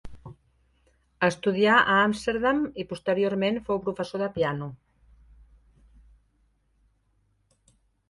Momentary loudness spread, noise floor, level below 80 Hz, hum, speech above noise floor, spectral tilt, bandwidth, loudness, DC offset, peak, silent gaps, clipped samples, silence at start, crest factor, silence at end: 12 LU; -69 dBFS; -56 dBFS; none; 44 dB; -5.5 dB/octave; 11.5 kHz; -25 LUFS; under 0.1%; -6 dBFS; none; under 0.1%; 0.05 s; 22 dB; 3.35 s